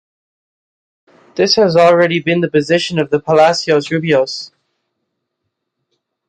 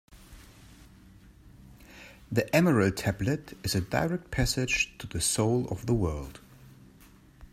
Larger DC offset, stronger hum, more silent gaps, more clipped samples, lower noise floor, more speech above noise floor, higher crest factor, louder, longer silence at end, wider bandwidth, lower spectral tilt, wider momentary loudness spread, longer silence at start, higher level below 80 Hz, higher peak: neither; neither; neither; neither; first, -74 dBFS vs -55 dBFS; first, 62 dB vs 27 dB; second, 14 dB vs 22 dB; first, -13 LUFS vs -28 LUFS; first, 1.8 s vs 0.05 s; second, 9.4 kHz vs 16 kHz; about the same, -5 dB/octave vs -4.5 dB/octave; about the same, 10 LU vs 12 LU; first, 1.35 s vs 0.1 s; second, -56 dBFS vs -46 dBFS; first, 0 dBFS vs -10 dBFS